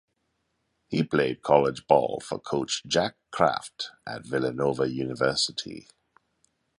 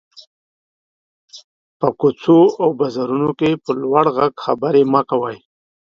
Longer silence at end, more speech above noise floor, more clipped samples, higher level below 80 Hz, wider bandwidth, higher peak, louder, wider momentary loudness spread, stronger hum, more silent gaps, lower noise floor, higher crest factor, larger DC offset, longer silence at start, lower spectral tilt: first, 1 s vs 0.5 s; second, 50 dB vs over 74 dB; neither; about the same, -60 dBFS vs -60 dBFS; first, 11.5 kHz vs 7.4 kHz; second, -4 dBFS vs 0 dBFS; second, -26 LUFS vs -16 LUFS; first, 13 LU vs 9 LU; neither; second, none vs 1.44-1.80 s; second, -76 dBFS vs under -90 dBFS; first, 24 dB vs 18 dB; neither; second, 0.9 s vs 1.35 s; second, -4.5 dB/octave vs -8 dB/octave